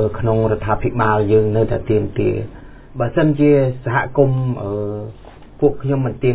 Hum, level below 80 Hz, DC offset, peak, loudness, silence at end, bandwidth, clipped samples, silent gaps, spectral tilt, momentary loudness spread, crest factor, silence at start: none; -36 dBFS; under 0.1%; -2 dBFS; -17 LUFS; 0 s; 4 kHz; under 0.1%; none; -12.5 dB/octave; 11 LU; 16 dB; 0 s